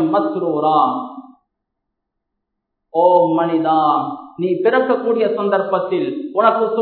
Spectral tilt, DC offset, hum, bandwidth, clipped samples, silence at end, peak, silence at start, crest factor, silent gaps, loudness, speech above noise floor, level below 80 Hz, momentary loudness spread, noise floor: -10.5 dB/octave; under 0.1%; none; 4.5 kHz; under 0.1%; 0 s; -2 dBFS; 0 s; 16 dB; none; -17 LUFS; 61 dB; -72 dBFS; 8 LU; -77 dBFS